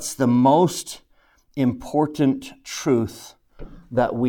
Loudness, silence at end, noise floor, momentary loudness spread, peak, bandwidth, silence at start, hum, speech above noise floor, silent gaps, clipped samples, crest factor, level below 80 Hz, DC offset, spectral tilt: -21 LUFS; 0 s; -59 dBFS; 19 LU; -4 dBFS; 18.5 kHz; 0 s; none; 38 dB; none; under 0.1%; 18 dB; -50 dBFS; under 0.1%; -6 dB/octave